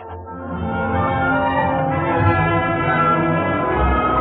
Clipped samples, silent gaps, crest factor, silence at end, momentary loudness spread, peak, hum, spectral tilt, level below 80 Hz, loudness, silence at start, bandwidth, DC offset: under 0.1%; none; 14 dB; 0 s; 9 LU; -4 dBFS; none; -5.5 dB/octave; -32 dBFS; -18 LUFS; 0 s; 4.5 kHz; under 0.1%